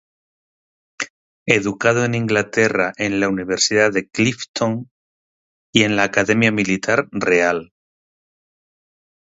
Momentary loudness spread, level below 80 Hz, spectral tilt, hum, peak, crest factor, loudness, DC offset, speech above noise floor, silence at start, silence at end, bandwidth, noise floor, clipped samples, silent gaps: 10 LU; -56 dBFS; -4 dB/octave; none; 0 dBFS; 20 dB; -18 LUFS; under 0.1%; over 72 dB; 1 s; 1.7 s; 8 kHz; under -90 dBFS; under 0.1%; 1.10-1.46 s, 4.49-4.54 s, 4.91-5.73 s